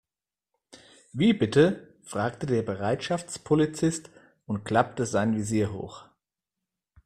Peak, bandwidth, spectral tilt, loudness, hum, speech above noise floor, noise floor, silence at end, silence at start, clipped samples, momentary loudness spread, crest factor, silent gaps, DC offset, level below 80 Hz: -6 dBFS; 13.5 kHz; -6 dB/octave; -26 LUFS; none; over 64 dB; under -90 dBFS; 1 s; 0.75 s; under 0.1%; 14 LU; 22 dB; none; under 0.1%; -60 dBFS